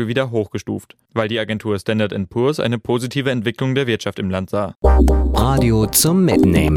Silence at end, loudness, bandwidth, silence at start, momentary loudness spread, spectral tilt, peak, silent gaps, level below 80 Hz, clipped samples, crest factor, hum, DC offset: 0 s; -18 LUFS; 17 kHz; 0 s; 9 LU; -5.5 dB/octave; 0 dBFS; 4.76-4.80 s; -24 dBFS; under 0.1%; 16 dB; none; under 0.1%